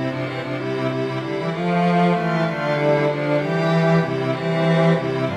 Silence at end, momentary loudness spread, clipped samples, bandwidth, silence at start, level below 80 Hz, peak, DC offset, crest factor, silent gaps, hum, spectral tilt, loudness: 0 s; 7 LU; under 0.1%; 9.2 kHz; 0 s; -58 dBFS; -6 dBFS; under 0.1%; 14 dB; none; none; -7.5 dB/octave; -20 LUFS